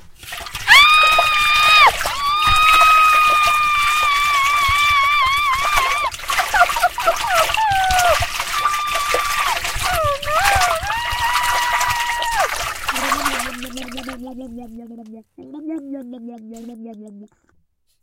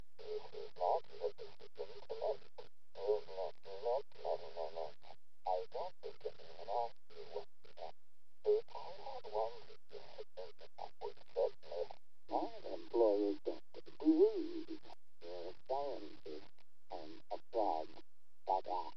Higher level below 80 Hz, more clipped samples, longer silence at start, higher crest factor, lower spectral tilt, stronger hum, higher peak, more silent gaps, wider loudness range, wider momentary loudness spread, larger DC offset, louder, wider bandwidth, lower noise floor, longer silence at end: first, -36 dBFS vs -80 dBFS; neither; second, 0 s vs 0.2 s; about the same, 18 dB vs 22 dB; second, -1 dB/octave vs -6.5 dB/octave; neither; first, 0 dBFS vs -20 dBFS; neither; first, 20 LU vs 8 LU; first, 22 LU vs 17 LU; second, under 0.1% vs 0.7%; first, -15 LUFS vs -41 LUFS; first, 17 kHz vs 6.4 kHz; second, -61 dBFS vs -80 dBFS; first, 0.75 s vs 0.05 s